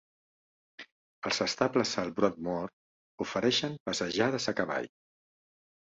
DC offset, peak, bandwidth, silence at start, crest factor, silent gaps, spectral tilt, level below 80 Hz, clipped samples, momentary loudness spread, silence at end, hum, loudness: under 0.1%; -12 dBFS; 8.2 kHz; 0.8 s; 22 dB; 0.92-1.22 s, 2.73-3.18 s, 3.80-3.86 s; -4 dB/octave; -68 dBFS; under 0.1%; 15 LU; 0.95 s; none; -31 LUFS